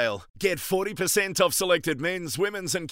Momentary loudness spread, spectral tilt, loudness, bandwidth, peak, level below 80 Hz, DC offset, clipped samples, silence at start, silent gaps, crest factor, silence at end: 6 LU; -3 dB/octave; -25 LUFS; 16 kHz; -6 dBFS; -58 dBFS; under 0.1%; under 0.1%; 0 s; 0.30-0.34 s; 20 dB; 0 s